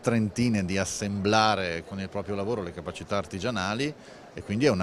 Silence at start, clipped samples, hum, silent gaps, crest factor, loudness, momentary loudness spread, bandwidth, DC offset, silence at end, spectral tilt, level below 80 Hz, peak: 0 s; under 0.1%; none; none; 20 dB; -28 LUFS; 12 LU; 13.5 kHz; under 0.1%; 0 s; -5 dB/octave; -56 dBFS; -6 dBFS